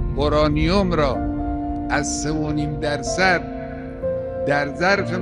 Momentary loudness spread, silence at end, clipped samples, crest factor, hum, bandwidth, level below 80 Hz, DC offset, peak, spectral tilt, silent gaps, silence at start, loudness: 8 LU; 0 s; under 0.1%; 16 dB; none; 11.5 kHz; -32 dBFS; under 0.1%; -4 dBFS; -5 dB/octave; none; 0 s; -21 LUFS